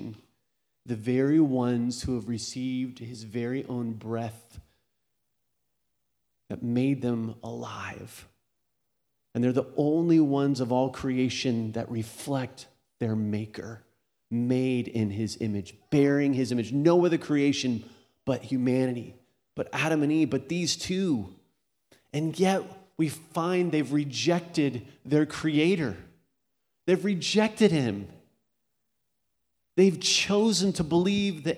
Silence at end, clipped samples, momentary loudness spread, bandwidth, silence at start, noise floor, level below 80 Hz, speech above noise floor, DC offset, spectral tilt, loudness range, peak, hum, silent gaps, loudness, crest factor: 0 s; under 0.1%; 14 LU; 15 kHz; 0 s; -81 dBFS; -60 dBFS; 54 dB; under 0.1%; -5.5 dB/octave; 8 LU; -8 dBFS; none; none; -27 LUFS; 20 dB